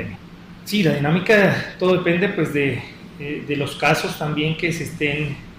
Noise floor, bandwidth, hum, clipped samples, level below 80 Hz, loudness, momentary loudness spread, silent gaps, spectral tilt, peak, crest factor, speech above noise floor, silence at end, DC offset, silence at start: -40 dBFS; 16 kHz; none; under 0.1%; -48 dBFS; -20 LUFS; 15 LU; none; -6 dB/octave; -2 dBFS; 18 dB; 20 dB; 0.05 s; under 0.1%; 0 s